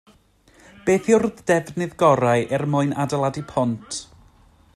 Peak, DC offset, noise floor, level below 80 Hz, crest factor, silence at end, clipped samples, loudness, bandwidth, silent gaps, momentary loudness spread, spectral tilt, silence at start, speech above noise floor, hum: -4 dBFS; under 0.1%; -55 dBFS; -56 dBFS; 18 dB; 0.7 s; under 0.1%; -21 LUFS; 14 kHz; none; 11 LU; -6 dB/octave; 0.85 s; 35 dB; none